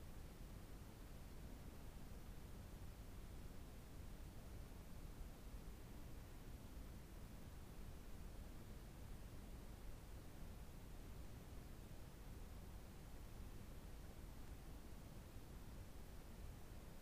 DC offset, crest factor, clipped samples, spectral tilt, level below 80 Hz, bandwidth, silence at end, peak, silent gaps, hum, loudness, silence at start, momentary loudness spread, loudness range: under 0.1%; 12 dB; under 0.1%; -5.5 dB/octave; -58 dBFS; 15.5 kHz; 0 s; -42 dBFS; none; none; -59 LUFS; 0 s; 1 LU; 0 LU